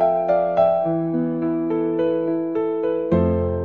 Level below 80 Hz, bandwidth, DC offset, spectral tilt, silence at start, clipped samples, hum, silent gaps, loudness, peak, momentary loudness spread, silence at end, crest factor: -50 dBFS; 4.5 kHz; 0.2%; -11 dB/octave; 0 s; under 0.1%; none; none; -21 LUFS; -6 dBFS; 5 LU; 0 s; 14 dB